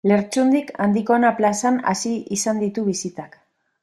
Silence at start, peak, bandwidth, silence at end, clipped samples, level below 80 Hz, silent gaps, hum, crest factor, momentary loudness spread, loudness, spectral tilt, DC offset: 0.05 s; -4 dBFS; 13 kHz; 0.55 s; under 0.1%; -64 dBFS; none; none; 16 dB; 7 LU; -20 LUFS; -5 dB/octave; under 0.1%